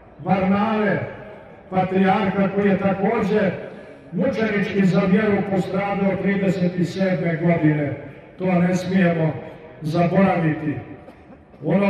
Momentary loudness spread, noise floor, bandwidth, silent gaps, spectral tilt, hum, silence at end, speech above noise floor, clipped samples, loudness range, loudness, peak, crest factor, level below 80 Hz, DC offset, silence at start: 14 LU; -45 dBFS; 8 kHz; none; -8 dB/octave; none; 0 s; 26 dB; under 0.1%; 1 LU; -20 LUFS; -6 dBFS; 16 dB; -52 dBFS; under 0.1%; 0.2 s